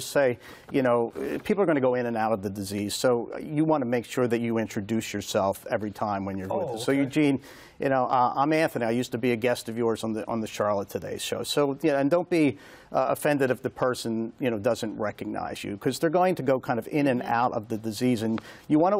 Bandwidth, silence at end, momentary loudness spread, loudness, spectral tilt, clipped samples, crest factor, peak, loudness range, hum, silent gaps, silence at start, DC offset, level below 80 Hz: 16 kHz; 0 s; 8 LU; -27 LUFS; -5.5 dB/octave; under 0.1%; 14 dB; -12 dBFS; 2 LU; none; none; 0 s; under 0.1%; -62 dBFS